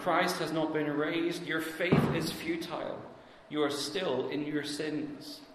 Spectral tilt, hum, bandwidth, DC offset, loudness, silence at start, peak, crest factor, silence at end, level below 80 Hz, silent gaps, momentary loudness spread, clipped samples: -5 dB/octave; none; 14 kHz; under 0.1%; -32 LUFS; 0 s; -12 dBFS; 20 dB; 0 s; -60 dBFS; none; 11 LU; under 0.1%